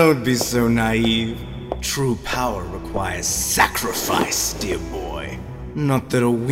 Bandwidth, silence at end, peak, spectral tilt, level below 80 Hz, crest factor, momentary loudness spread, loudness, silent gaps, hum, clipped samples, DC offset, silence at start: 16 kHz; 0 s; -2 dBFS; -4 dB/octave; -36 dBFS; 18 dB; 12 LU; -21 LUFS; none; none; under 0.1%; under 0.1%; 0 s